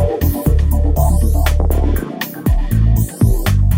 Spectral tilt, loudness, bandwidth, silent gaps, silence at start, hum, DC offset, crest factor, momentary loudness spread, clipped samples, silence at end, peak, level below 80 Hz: -7 dB/octave; -16 LUFS; 16.5 kHz; none; 0 s; none; under 0.1%; 10 dB; 4 LU; under 0.1%; 0 s; -2 dBFS; -16 dBFS